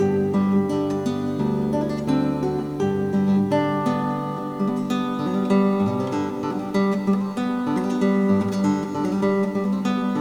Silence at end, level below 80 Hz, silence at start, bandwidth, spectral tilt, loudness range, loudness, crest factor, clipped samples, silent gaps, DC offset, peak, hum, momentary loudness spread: 0 s; -54 dBFS; 0 s; 11 kHz; -7.5 dB/octave; 1 LU; -22 LUFS; 12 dB; under 0.1%; none; under 0.1%; -8 dBFS; none; 5 LU